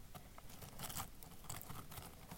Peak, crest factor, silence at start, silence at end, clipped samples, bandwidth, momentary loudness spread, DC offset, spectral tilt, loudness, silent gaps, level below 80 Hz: -28 dBFS; 22 dB; 0 s; 0 s; under 0.1%; 17 kHz; 10 LU; under 0.1%; -3 dB/octave; -51 LUFS; none; -60 dBFS